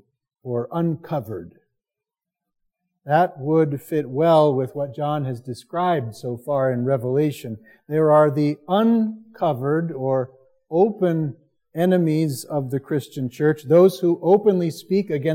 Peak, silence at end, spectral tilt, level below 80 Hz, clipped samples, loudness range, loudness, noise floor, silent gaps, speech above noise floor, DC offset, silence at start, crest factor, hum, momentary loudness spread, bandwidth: -4 dBFS; 0 s; -8 dB/octave; -70 dBFS; under 0.1%; 5 LU; -21 LUFS; -87 dBFS; none; 67 dB; under 0.1%; 0.45 s; 18 dB; none; 13 LU; 16.5 kHz